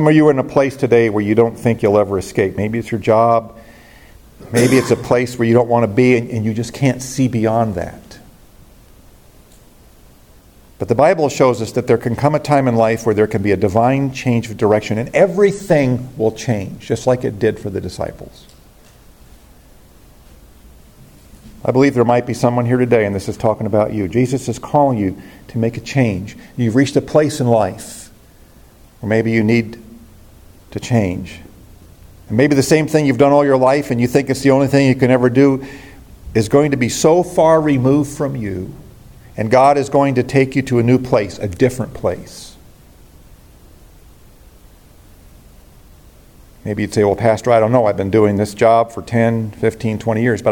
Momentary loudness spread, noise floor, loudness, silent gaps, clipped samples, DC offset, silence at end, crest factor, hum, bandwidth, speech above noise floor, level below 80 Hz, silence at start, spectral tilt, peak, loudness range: 11 LU; -45 dBFS; -15 LUFS; none; under 0.1%; under 0.1%; 0 s; 16 dB; none; 17 kHz; 31 dB; -46 dBFS; 0 s; -6.5 dB/octave; 0 dBFS; 8 LU